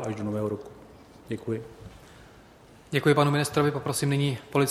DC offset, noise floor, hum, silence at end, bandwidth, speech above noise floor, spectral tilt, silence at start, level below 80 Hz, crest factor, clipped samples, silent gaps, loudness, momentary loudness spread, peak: under 0.1%; -52 dBFS; none; 0 s; 15.5 kHz; 26 dB; -5.5 dB/octave; 0 s; -58 dBFS; 20 dB; under 0.1%; none; -27 LUFS; 21 LU; -8 dBFS